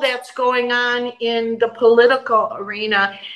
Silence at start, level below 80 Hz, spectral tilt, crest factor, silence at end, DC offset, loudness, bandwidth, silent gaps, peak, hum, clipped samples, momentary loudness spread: 0 s; -74 dBFS; -3.5 dB/octave; 16 dB; 0 s; under 0.1%; -17 LUFS; 11.5 kHz; none; -2 dBFS; none; under 0.1%; 8 LU